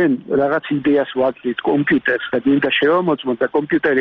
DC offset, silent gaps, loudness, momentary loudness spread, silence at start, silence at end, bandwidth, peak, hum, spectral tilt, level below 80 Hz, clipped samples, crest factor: under 0.1%; none; -17 LUFS; 4 LU; 0 s; 0 s; 4.5 kHz; -6 dBFS; none; -3.5 dB/octave; -56 dBFS; under 0.1%; 10 dB